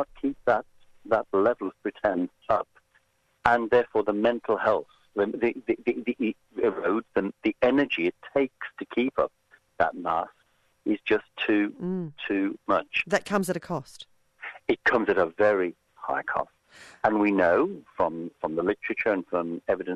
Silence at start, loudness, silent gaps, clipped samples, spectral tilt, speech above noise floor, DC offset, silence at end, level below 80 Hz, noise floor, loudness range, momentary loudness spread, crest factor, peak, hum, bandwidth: 0 s; -27 LUFS; none; under 0.1%; -6 dB/octave; 41 dB; under 0.1%; 0 s; -60 dBFS; -67 dBFS; 3 LU; 9 LU; 26 dB; -2 dBFS; none; 13 kHz